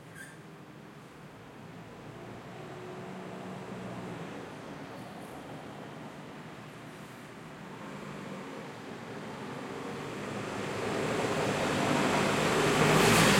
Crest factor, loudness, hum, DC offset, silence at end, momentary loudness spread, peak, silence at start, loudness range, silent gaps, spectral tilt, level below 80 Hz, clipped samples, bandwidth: 24 dB; -32 LUFS; none; under 0.1%; 0 s; 20 LU; -10 dBFS; 0 s; 15 LU; none; -4 dB/octave; -58 dBFS; under 0.1%; 16.5 kHz